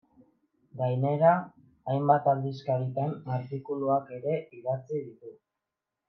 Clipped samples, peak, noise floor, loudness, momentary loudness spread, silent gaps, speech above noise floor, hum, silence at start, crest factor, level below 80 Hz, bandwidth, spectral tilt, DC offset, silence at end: under 0.1%; -8 dBFS; -87 dBFS; -29 LUFS; 13 LU; none; 59 dB; none; 0.75 s; 20 dB; -78 dBFS; 6 kHz; -10 dB/octave; under 0.1%; 0.75 s